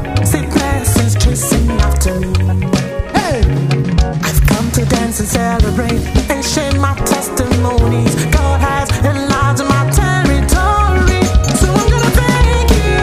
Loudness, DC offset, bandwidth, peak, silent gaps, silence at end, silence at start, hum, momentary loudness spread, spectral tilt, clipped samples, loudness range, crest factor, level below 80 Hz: -13 LUFS; under 0.1%; 16 kHz; 0 dBFS; none; 0 s; 0 s; none; 3 LU; -5 dB/octave; under 0.1%; 2 LU; 12 dB; -16 dBFS